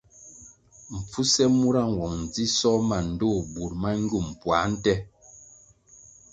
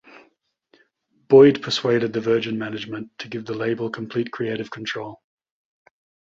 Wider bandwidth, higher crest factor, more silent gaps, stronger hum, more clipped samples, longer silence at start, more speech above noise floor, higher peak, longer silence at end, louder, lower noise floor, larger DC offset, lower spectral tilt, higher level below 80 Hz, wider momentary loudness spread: first, 9.4 kHz vs 7.6 kHz; about the same, 20 dB vs 20 dB; neither; neither; neither; second, 0.2 s vs 1.3 s; second, 29 dB vs 43 dB; second, -8 dBFS vs -2 dBFS; second, 0.9 s vs 1.05 s; second, -25 LUFS vs -21 LUFS; second, -54 dBFS vs -64 dBFS; neither; second, -4.5 dB/octave vs -6 dB/octave; first, -46 dBFS vs -64 dBFS; second, 15 LU vs 19 LU